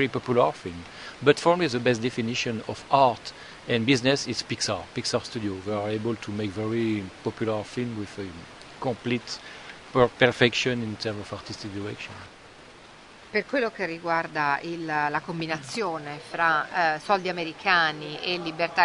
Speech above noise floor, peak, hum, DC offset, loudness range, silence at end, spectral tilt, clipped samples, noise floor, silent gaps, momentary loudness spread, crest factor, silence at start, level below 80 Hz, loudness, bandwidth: 22 dB; -2 dBFS; none; under 0.1%; 6 LU; 0 s; -4.5 dB/octave; under 0.1%; -49 dBFS; none; 15 LU; 24 dB; 0 s; -60 dBFS; -26 LUFS; 11 kHz